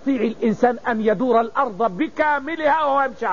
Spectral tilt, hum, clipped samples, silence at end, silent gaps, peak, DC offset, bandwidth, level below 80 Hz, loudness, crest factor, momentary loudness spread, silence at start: -4 dB/octave; none; under 0.1%; 0 s; none; -6 dBFS; 0.8%; 7.2 kHz; -56 dBFS; -20 LUFS; 14 dB; 4 LU; 0.05 s